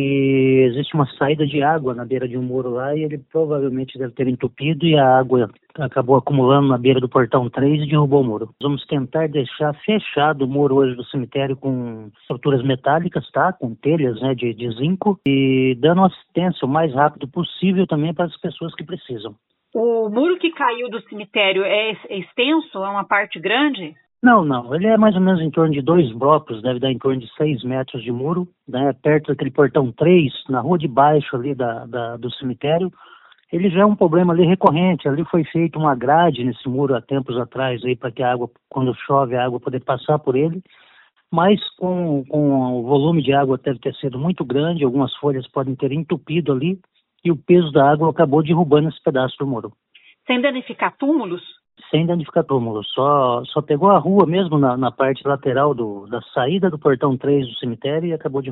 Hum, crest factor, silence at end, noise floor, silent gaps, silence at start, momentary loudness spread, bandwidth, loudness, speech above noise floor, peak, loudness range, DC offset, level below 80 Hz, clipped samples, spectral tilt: none; 18 dB; 0 s; -53 dBFS; none; 0 s; 10 LU; 4.1 kHz; -18 LUFS; 35 dB; 0 dBFS; 4 LU; under 0.1%; -58 dBFS; under 0.1%; -11 dB/octave